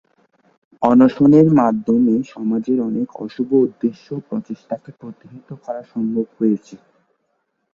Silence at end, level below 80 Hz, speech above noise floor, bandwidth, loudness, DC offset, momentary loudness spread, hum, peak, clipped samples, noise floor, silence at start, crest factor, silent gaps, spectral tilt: 1 s; -58 dBFS; 53 dB; 7 kHz; -17 LUFS; under 0.1%; 18 LU; none; 0 dBFS; under 0.1%; -70 dBFS; 0.8 s; 18 dB; none; -9.5 dB/octave